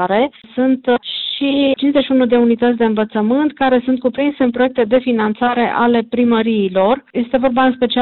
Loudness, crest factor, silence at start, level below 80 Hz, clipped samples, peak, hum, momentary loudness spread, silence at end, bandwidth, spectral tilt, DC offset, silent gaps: -15 LUFS; 12 dB; 0 s; -50 dBFS; under 0.1%; -4 dBFS; none; 4 LU; 0 s; 4.3 kHz; -10.5 dB/octave; 0.2%; none